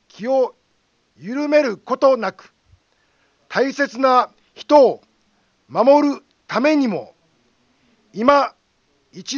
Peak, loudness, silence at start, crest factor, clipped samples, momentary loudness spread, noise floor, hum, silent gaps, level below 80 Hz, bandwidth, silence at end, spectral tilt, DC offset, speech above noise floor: 0 dBFS; -18 LUFS; 0.2 s; 20 dB; under 0.1%; 15 LU; -64 dBFS; none; none; -66 dBFS; 7.2 kHz; 0 s; -5 dB/octave; under 0.1%; 48 dB